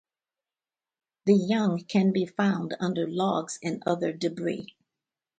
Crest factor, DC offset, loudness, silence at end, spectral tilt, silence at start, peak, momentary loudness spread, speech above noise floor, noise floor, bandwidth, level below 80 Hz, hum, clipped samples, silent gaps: 18 dB; under 0.1%; -27 LUFS; 0.75 s; -6.5 dB/octave; 1.25 s; -10 dBFS; 9 LU; over 64 dB; under -90 dBFS; 9.2 kHz; -72 dBFS; none; under 0.1%; none